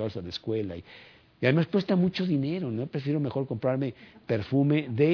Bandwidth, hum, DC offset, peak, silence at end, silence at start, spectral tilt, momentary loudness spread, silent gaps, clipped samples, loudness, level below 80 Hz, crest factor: 5.4 kHz; none; under 0.1%; -8 dBFS; 0 s; 0 s; -9 dB/octave; 10 LU; none; under 0.1%; -28 LUFS; -62 dBFS; 20 dB